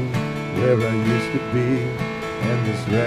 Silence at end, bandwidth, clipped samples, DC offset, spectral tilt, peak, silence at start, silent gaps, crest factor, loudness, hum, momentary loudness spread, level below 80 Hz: 0 s; 14.5 kHz; under 0.1%; under 0.1%; -7 dB/octave; -6 dBFS; 0 s; none; 14 dB; -22 LUFS; none; 6 LU; -48 dBFS